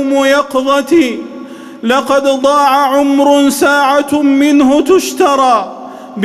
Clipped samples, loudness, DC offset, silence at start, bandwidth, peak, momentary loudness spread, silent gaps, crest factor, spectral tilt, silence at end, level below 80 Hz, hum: under 0.1%; -10 LUFS; under 0.1%; 0 s; 14 kHz; 0 dBFS; 15 LU; none; 10 dB; -3.5 dB/octave; 0 s; -50 dBFS; none